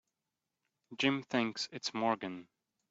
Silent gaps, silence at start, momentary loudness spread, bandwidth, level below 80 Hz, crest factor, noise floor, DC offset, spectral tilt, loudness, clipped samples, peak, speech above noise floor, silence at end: none; 0.9 s; 13 LU; 8 kHz; -80 dBFS; 20 dB; -89 dBFS; under 0.1%; -4 dB/octave; -35 LUFS; under 0.1%; -16 dBFS; 54 dB; 0.45 s